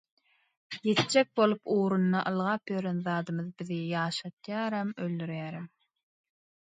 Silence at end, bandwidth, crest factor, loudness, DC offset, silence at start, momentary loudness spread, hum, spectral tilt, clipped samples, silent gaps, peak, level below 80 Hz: 1.1 s; 9.4 kHz; 20 dB; -30 LUFS; under 0.1%; 0.7 s; 11 LU; none; -5.5 dB/octave; under 0.1%; 4.33-4.37 s; -10 dBFS; -76 dBFS